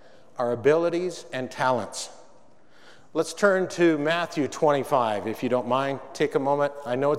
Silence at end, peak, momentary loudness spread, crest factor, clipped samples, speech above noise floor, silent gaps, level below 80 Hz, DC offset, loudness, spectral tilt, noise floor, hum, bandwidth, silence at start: 0 s; -6 dBFS; 11 LU; 20 dB; under 0.1%; 33 dB; none; -72 dBFS; 0.4%; -25 LUFS; -5 dB/octave; -57 dBFS; none; 15 kHz; 0.4 s